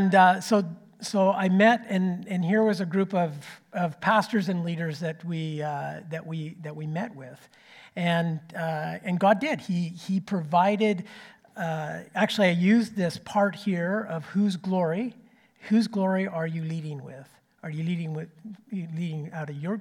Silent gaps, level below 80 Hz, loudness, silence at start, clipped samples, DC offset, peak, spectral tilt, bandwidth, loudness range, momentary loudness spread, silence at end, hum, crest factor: none; -74 dBFS; -26 LUFS; 0 s; under 0.1%; under 0.1%; -6 dBFS; -6.5 dB/octave; 14 kHz; 7 LU; 15 LU; 0 s; none; 20 dB